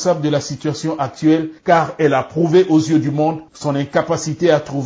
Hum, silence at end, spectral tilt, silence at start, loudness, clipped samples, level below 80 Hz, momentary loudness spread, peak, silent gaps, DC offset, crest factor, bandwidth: none; 0 s; -6 dB/octave; 0 s; -17 LUFS; under 0.1%; -54 dBFS; 8 LU; -2 dBFS; none; under 0.1%; 14 dB; 8 kHz